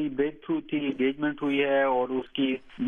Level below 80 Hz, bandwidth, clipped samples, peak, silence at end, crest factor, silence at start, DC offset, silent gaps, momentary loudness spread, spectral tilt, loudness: -62 dBFS; 3.7 kHz; under 0.1%; -14 dBFS; 0 s; 14 dB; 0 s; under 0.1%; none; 6 LU; -7.5 dB/octave; -27 LUFS